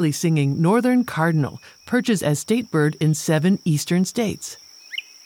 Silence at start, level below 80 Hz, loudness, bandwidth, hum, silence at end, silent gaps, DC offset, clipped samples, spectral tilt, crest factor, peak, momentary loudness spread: 0 s; -62 dBFS; -20 LUFS; 17.5 kHz; none; 0.25 s; none; under 0.1%; under 0.1%; -6 dB/octave; 14 dB; -6 dBFS; 13 LU